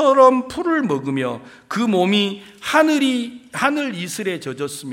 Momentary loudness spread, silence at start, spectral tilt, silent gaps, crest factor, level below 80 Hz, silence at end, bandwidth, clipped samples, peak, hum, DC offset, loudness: 13 LU; 0 s; -4.5 dB/octave; none; 18 dB; -60 dBFS; 0 s; 16.5 kHz; under 0.1%; 0 dBFS; none; under 0.1%; -19 LUFS